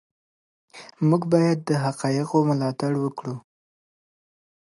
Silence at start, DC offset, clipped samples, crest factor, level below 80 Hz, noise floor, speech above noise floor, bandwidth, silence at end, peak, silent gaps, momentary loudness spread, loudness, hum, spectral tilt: 0.75 s; under 0.1%; under 0.1%; 18 dB; -70 dBFS; under -90 dBFS; over 68 dB; 11.5 kHz; 1.25 s; -6 dBFS; none; 11 LU; -23 LUFS; none; -7.5 dB/octave